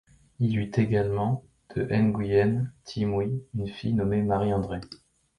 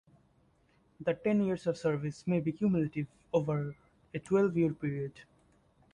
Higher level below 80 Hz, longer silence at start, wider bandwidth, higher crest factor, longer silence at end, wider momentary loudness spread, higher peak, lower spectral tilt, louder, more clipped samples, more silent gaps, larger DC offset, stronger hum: first, -50 dBFS vs -66 dBFS; second, 0.4 s vs 1 s; about the same, 10.5 kHz vs 10.5 kHz; about the same, 16 dB vs 16 dB; second, 0.45 s vs 0.7 s; about the same, 10 LU vs 11 LU; first, -10 dBFS vs -16 dBFS; about the same, -8.5 dB/octave vs -8.5 dB/octave; first, -27 LUFS vs -33 LUFS; neither; neither; neither; neither